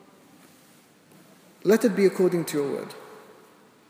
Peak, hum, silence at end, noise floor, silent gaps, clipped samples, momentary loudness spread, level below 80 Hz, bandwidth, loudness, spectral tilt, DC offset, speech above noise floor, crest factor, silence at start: -6 dBFS; none; 0.7 s; -56 dBFS; none; under 0.1%; 21 LU; -82 dBFS; 16 kHz; -24 LUFS; -6 dB/octave; under 0.1%; 33 dB; 20 dB; 1.65 s